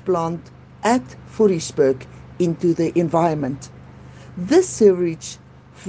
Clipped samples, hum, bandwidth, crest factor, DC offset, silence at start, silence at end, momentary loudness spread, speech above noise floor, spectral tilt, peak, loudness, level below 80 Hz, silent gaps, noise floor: under 0.1%; none; 9.8 kHz; 18 dB; under 0.1%; 0.05 s; 0 s; 19 LU; 22 dB; -6 dB/octave; -2 dBFS; -19 LUFS; -52 dBFS; none; -41 dBFS